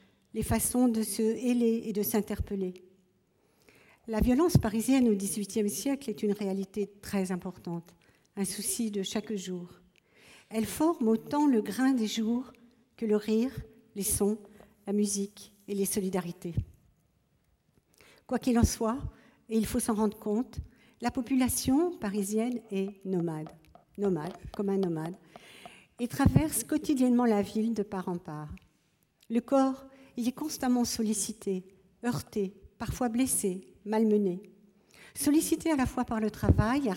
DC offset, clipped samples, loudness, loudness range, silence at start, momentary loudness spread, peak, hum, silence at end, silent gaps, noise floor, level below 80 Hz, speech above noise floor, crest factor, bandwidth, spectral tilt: under 0.1%; under 0.1%; -30 LUFS; 5 LU; 0.35 s; 14 LU; -10 dBFS; none; 0 s; none; -71 dBFS; -48 dBFS; 42 dB; 20 dB; 17 kHz; -5.5 dB/octave